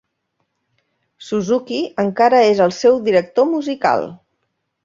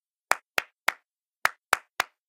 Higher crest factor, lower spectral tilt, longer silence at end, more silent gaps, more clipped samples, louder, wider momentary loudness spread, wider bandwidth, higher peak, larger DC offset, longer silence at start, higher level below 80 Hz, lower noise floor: second, 16 dB vs 30 dB; first, -5.5 dB/octave vs 0.5 dB/octave; first, 0.7 s vs 0.25 s; second, none vs 1.36-1.42 s; neither; first, -16 LUFS vs -29 LUFS; first, 10 LU vs 5 LU; second, 7.6 kHz vs 17 kHz; about the same, -2 dBFS vs 0 dBFS; neither; first, 1.2 s vs 0.3 s; first, -62 dBFS vs -72 dBFS; first, -72 dBFS vs -67 dBFS